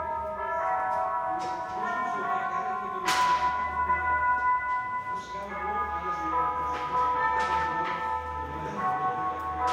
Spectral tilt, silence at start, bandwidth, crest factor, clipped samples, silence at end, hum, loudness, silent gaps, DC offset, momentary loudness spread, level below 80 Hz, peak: -3.5 dB/octave; 0 s; 15.5 kHz; 16 dB; under 0.1%; 0 s; none; -28 LUFS; none; under 0.1%; 7 LU; -50 dBFS; -12 dBFS